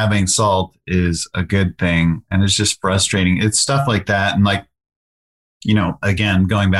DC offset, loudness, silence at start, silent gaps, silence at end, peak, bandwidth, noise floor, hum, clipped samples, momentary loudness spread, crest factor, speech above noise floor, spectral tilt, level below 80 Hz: 0.1%; -17 LUFS; 0 s; 4.96-5.61 s; 0 s; -4 dBFS; 12.5 kHz; under -90 dBFS; none; under 0.1%; 5 LU; 12 dB; over 74 dB; -4.5 dB/octave; -40 dBFS